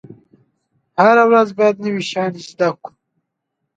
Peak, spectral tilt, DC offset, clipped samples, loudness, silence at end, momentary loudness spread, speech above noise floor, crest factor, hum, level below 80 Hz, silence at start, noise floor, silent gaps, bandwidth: 0 dBFS; -5.5 dB/octave; under 0.1%; under 0.1%; -15 LUFS; 0.9 s; 13 LU; 61 dB; 18 dB; none; -68 dBFS; 0.1 s; -76 dBFS; none; 8.8 kHz